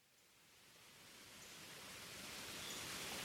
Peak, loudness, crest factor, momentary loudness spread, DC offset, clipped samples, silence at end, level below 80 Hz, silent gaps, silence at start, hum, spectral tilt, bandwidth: -36 dBFS; -51 LUFS; 18 dB; 19 LU; under 0.1%; under 0.1%; 0 s; -76 dBFS; none; 0 s; none; -1.5 dB/octave; 19.5 kHz